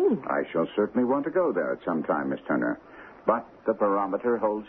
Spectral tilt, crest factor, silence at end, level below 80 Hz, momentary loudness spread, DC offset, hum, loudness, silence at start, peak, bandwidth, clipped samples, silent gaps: -10 dB/octave; 18 dB; 0 s; -66 dBFS; 5 LU; under 0.1%; none; -27 LUFS; 0 s; -10 dBFS; 3.9 kHz; under 0.1%; none